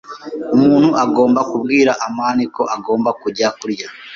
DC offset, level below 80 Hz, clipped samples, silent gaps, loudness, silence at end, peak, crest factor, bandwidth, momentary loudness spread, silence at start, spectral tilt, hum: under 0.1%; -56 dBFS; under 0.1%; none; -15 LUFS; 0 s; -2 dBFS; 14 dB; 7.4 kHz; 12 LU; 0.1 s; -5.5 dB/octave; none